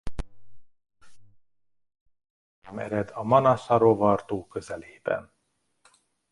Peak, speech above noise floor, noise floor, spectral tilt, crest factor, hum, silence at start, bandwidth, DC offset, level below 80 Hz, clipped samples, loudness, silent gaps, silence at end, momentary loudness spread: -6 dBFS; 51 dB; -75 dBFS; -7.5 dB/octave; 22 dB; none; 0.05 s; 11.5 kHz; under 0.1%; -48 dBFS; under 0.1%; -25 LUFS; 2.01-2.06 s, 2.30-2.62 s; 1.1 s; 20 LU